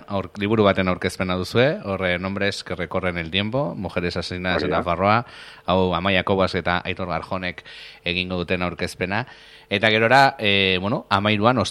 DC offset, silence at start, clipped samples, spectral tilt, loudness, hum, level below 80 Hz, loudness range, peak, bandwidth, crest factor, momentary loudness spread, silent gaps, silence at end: under 0.1%; 0 s; under 0.1%; -5.5 dB/octave; -21 LUFS; none; -50 dBFS; 4 LU; 0 dBFS; 13.5 kHz; 22 dB; 10 LU; none; 0 s